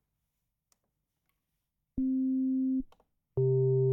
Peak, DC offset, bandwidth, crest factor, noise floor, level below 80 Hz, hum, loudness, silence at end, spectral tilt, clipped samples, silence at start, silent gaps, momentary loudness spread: -20 dBFS; under 0.1%; 1.2 kHz; 12 dB; -84 dBFS; -58 dBFS; none; -30 LUFS; 0 s; -14 dB/octave; under 0.1%; 1.95 s; none; 13 LU